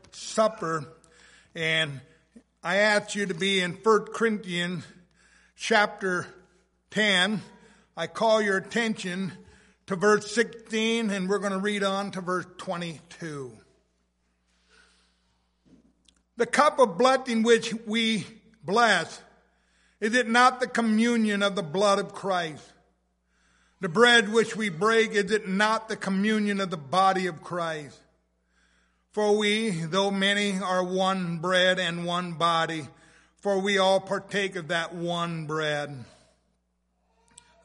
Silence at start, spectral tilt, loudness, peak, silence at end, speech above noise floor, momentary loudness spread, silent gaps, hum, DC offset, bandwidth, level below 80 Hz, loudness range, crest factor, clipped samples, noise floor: 0.15 s; -4 dB/octave; -25 LUFS; -6 dBFS; 1.6 s; 48 dB; 14 LU; none; none; under 0.1%; 11.5 kHz; -70 dBFS; 6 LU; 22 dB; under 0.1%; -73 dBFS